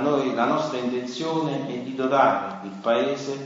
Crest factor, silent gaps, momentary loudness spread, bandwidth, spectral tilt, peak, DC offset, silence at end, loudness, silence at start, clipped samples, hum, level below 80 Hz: 18 dB; none; 9 LU; 7.8 kHz; -5.5 dB/octave; -6 dBFS; under 0.1%; 0 s; -24 LUFS; 0 s; under 0.1%; none; -72 dBFS